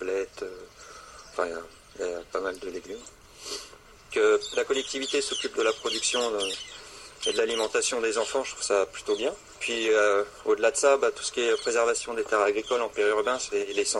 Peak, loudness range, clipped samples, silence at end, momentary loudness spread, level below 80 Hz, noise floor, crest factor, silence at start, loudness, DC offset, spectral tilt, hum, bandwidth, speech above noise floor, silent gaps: -8 dBFS; 10 LU; under 0.1%; 0 s; 17 LU; -60 dBFS; -47 dBFS; 20 dB; 0 s; -27 LUFS; under 0.1%; -1 dB/octave; none; 12 kHz; 21 dB; none